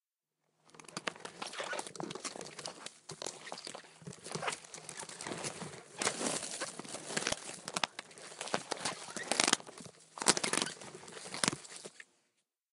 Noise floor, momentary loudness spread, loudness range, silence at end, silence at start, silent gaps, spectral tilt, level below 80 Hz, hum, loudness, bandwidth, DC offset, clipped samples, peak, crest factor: -86 dBFS; 17 LU; 9 LU; 0.7 s; 0.65 s; none; -1.5 dB/octave; -78 dBFS; none; -37 LUFS; 16 kHz; under 0.1%; under 0.1%; -2 dBFS; 38 dB